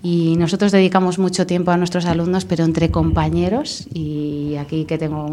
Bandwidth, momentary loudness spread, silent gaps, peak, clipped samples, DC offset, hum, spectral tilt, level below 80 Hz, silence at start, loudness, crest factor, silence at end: 11 kHz; 9 LU; none; 0 dBFS; under 0.1%; under 0.1%; none; -6.5 dB/octave; -36 dBFS; 0 s; -18 LUFS; 16 dB; 0 s